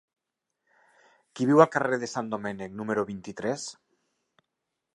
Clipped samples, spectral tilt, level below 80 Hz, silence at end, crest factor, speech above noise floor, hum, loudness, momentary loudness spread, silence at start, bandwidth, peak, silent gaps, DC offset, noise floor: under 0.1%; -5.5 dB/octave; -70 dBFS; 1.2 s; 26 dB; 58 dB; none; -27 LUFS; 15 LU; 1.35 s; 11 kHz; -2 dBFS; none; under 0.1%; -84 dBFS